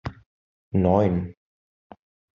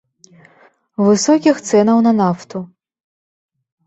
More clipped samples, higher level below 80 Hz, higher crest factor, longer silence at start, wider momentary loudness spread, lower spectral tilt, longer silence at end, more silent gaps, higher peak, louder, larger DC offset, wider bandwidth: neither; first, -54 dBFS vs -60 dBFS; about the same, 20 dB vs 16 dB; second, 0.05 s vs 1 s; about the same, 18 LU vs 17 LU; first, -9 dB/octave vs -5.5 dB/octave; second, 1.05 s vs 1.2 s; first, 0.26-0.71 s vs none; second, -6 dBFS vs -2 dBFS; second, -23 LUFS vs -14 LUFS; neither; second, 6.6 kHz vs 8.2 kHz